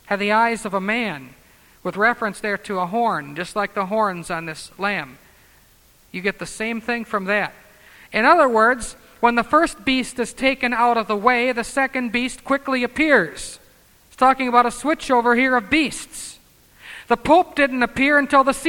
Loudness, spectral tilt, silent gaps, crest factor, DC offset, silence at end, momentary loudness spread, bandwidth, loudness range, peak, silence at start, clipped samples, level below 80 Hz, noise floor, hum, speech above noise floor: -19 LUFS; -4 dB/octave; none; 20 dB; under 0.1%; 0 s; 12 LU; 18 kHz; 7 LU; 0 dBFS; 0.1 s; under 0.1%; -50 dBFS; -54 dBFS; none; 34 dB